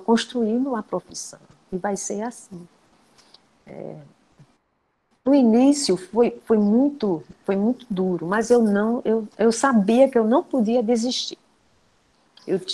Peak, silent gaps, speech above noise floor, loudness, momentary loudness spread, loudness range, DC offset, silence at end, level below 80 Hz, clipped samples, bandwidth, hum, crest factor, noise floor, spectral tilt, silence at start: -4 dBFS; none; 49 dB; -21 LUFS; 17 LU; 13 LU; under 0.1%; 0 s; -62 dBFS; under 0.1%; 12 kHz; none; 18 dB; -70 dBFS; -5 dB/octave; 0 s